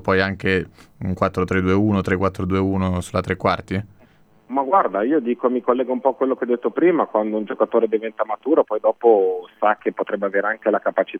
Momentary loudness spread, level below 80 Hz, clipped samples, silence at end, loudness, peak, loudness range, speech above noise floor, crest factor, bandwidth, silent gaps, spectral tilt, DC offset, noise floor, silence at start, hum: 7 LU; -52 dBFS; under 0.1%; 0 s; -20 LUFS; -2 dBFS; 2 LU; 33 dB; 18 dB; 11 kHz; none; -7.5 dB/octave; under 0.1%; -53 dBFS; 0.05 s; none